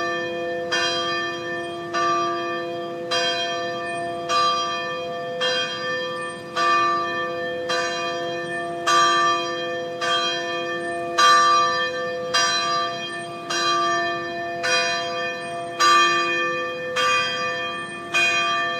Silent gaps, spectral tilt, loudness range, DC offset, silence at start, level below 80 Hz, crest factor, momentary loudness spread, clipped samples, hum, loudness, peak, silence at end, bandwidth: none; -2 dB/octave; 4 LU; under 0.1%; 0 s; -70 dBFS; 18 dB; 11 LU; under 0.1%; none; -22 LUFS; -4 dBFS; 0 s; 15 kHz